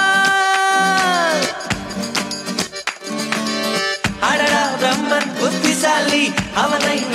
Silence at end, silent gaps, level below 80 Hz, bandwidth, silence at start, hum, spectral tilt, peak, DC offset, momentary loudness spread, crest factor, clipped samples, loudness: 0 s; none; -48 dBFS; 16 kHz; 0 s; none; -2.5 dB/octave; -2 dBFS; under 0.1%; 8 LU; 16 dB; under 0.1%; -17 LUFS